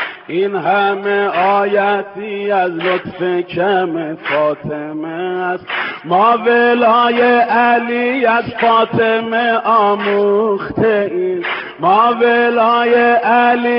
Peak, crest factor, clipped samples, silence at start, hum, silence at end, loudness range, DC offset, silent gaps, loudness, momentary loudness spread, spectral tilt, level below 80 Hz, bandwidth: 0 dBFS; 14 dB; under 0.1%; 0 s; none; 0 s; 5 LU; under 0.1%; none; -14 LUFS; 9 LU; -2.5 dB/octave; -56 dBFS; 5.6 kHz